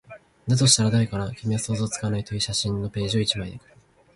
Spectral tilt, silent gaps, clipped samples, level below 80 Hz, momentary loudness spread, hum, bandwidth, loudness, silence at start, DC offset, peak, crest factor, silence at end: -4 dB/octave; none; under 0.1%; -48 dBFS; 11 LU; none; 11.5 kHz; -23 LUFS; 0.1 s; under 0.1%; -2 dBFS; 22 dB; 0.6 s